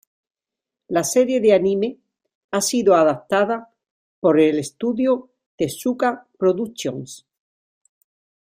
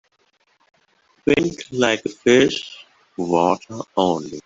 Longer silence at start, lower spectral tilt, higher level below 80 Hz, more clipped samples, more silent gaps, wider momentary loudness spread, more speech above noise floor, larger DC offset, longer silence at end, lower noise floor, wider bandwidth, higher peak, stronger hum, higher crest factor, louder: second, 0.9 s vs 1.25 s; about the same, -4.5 dB/octave vs -4.5 dB/octave; second, -64 dBFS vs -56 dBFS; neither; first, 2.35-2.49 s, 3.90-4.22 s, 5.46-5.58 s vs none; about the same, 11 LU vs 13 LU; first, 68 dB vs 44 dB; neither; first, 1.35 s vs 0.05 s; first, -87 dBFS vs -63 dBFS; first, 16 kHz vs 8 kHz; about the same, -4 dBFS vs -2 dBFS; neither; about the same, 18 dB vs 20 dB; about the same, -20 LUFS vs -20 LUFS